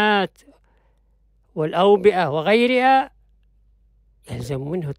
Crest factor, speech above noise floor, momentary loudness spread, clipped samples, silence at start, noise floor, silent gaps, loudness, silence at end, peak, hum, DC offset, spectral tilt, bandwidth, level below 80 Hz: 16 dB; 41 dB; 17 LU; under 0.1%; 0 s; -59 dBFS; none; -19 LUFS; 0.05 s; -4 dBFS; none; under 0.1%; -6 dB/octave; 12 kHz; -54 dBFS